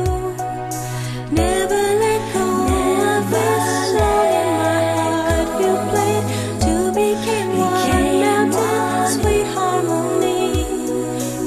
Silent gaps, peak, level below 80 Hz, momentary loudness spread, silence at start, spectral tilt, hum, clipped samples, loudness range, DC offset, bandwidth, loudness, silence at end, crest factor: none; -4 dBFS; -32 dBFS; 6 LU; 0 s; -5 dB/octave; none; under 0.1%; 1 LU; under 0.1%; 14 kHz; -18 LUFS; 0 s; 14 dB